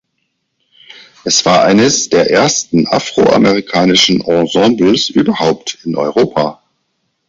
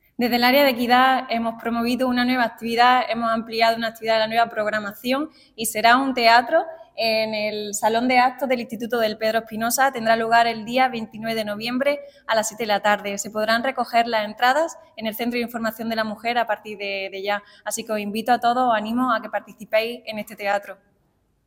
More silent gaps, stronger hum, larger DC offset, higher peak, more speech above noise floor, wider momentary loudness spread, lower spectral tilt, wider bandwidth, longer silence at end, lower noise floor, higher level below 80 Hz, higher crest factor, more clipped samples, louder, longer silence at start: neither; neither; neither; about the same, 0 dBFS vs -2 dBFS; first, 56 dB vs 44 dB; about the same, 8 LU vs 10 LU; about the same, -3.5 dB/octave vs -3 dB/octave; second, 7.8 kHz vs 17 kHz; about the same, 0.75 s vs 0.7 s; about the same, -67 dBFS vs -66 dBFS; first, -48 dBFS vs -62 dBFS; second, 12 dB vs 20 dB; neither; first, -11 LUFS vs -21 LUFS; first, 1.25 s vs 0.2 s